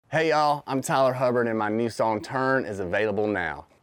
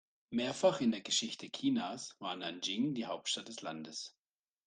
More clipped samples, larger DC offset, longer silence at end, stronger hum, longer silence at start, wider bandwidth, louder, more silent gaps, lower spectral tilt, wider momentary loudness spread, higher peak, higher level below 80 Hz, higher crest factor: neither; neither; second, 0.2 s vs 0.6 s; neither; second, 0.1 s vs 0.3 s; first, 18 kHz vs 10 kHz; first, -25 LUFS vs -36 LUFS; neither; first, -5.5 dB/octave vs -3.5 dB/octave; second, 5 LU vs 12 LU; first, -12 dBFS vs -18 dBFS; first, -64 dBFS vs -82 dBFS; second, 12 dB vs 20 dB